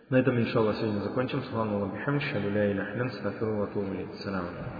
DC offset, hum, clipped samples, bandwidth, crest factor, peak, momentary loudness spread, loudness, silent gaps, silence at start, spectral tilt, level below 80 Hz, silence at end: under 0.1%; none; under 0.1%; 5 kHz; 18 dB; -12 dBFS; 8 LU; -30 LUFS; none; 0.1 s; -9 dB/octave; -60 dBFS; 0 s